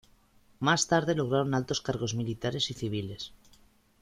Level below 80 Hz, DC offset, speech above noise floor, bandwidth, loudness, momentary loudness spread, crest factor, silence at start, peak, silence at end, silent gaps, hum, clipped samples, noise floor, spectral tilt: -58 dBFS; under 0.1%; 33 dB; 14.5 kHz; -29 LUFS; 10 LU; 20 dB; 0.6 s; -10 dBFS; 0.7 s; none; none; under 0.1%; -62 dBFS; -4.5 dB/octave